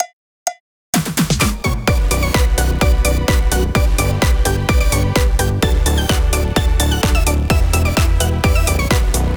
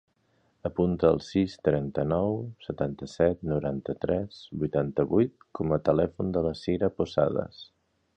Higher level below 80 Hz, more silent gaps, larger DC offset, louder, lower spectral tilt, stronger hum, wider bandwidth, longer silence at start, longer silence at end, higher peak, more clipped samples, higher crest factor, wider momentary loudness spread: first, -18 dBFS vs -50 dBFS; first, 0.13-0.46 s, 0.60-0.93 s vs none; neither; first, -16 LUFS vs -28 LUFS; second, -4.5 dB/octave vs -8.5 dB/octave; neither; first, over 20 kHz vs 9 kHz; second, 0 s vs 0.65 s; second, 0 s vs 0.5 s; first, -2 dBFS vs -8 dBFS; neither; second, 12 dB vs 20 dB; second, 2 LU vs 9 LU